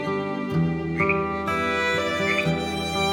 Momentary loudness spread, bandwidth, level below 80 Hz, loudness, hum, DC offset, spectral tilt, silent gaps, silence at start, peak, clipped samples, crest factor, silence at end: 4 LU; 18 kHz; -46 dBFS; -24 LUFS; none; under 0.1%; -5.5 dB/octave; none; 0 s; -8 dBFS; under 0.1%; 16 dB; 0 s